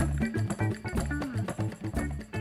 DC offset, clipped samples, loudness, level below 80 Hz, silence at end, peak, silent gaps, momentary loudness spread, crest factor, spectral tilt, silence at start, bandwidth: under 0.1%; under 0.1%; -32 LUFS; -38 dBFS; 0 s; -16 dBFS; none; 4 LU; 14 dB; -6.5 dB/octave; 0 s; 14.5 kHz